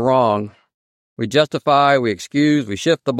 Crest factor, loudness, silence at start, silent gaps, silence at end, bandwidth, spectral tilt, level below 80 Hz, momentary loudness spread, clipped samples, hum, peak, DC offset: 16 dB; -17 LUFS; 0 s; 0.74-1.16 s; 0 s; 13 kHz; -5.5 dB/octave; -60 dBFS; 9 LU; under 0.1%; none; -2 dBFS; under 0.1%